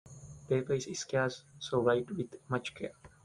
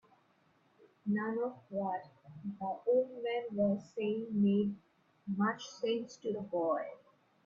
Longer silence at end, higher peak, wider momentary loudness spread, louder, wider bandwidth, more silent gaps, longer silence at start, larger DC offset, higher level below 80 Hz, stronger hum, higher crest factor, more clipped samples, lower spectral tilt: second, 0.15 s vs 0.5 s; first, -14 dBFS vs -20 dBFS; about the same, 14 LU vs 12 LU; about the same, -34 LUFS vs -36 LUFS; first, 11 kHz vs 7.2 kHz; neither; second, 0.05 s vs 1.05 s; neither; first, -66 dBFS vs -76 dBFS; neither; about the same, 20 dB vs 16 dB; neither; second, -5 dB/octave vs -7 dB/octave